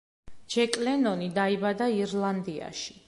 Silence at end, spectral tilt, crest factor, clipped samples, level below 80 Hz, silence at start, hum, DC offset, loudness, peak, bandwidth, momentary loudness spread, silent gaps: 0.15 s; -5 dB/octave; 22 dB; under 0.1%; -64 dBFS; 0.25 s; none; under 0.1%; -28 LUFS; -6 dBFS; 11.5 kHz; 9 LU; none